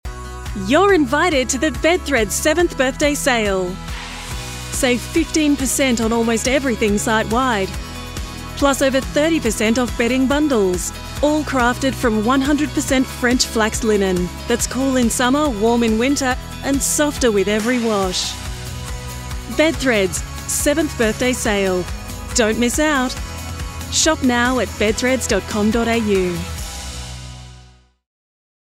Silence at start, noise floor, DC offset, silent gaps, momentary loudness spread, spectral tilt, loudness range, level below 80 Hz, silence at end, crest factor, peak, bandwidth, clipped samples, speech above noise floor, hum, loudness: 0.05 s; -46 dBFS; under 0.1%; none; 12 LU; -3.5 dB/octave; 2 LU; -32 dBFS; 1 s; 18 dB; 0 dBFS; 16 kHz; under 0.1%; 29 dB; none; -18 LUFS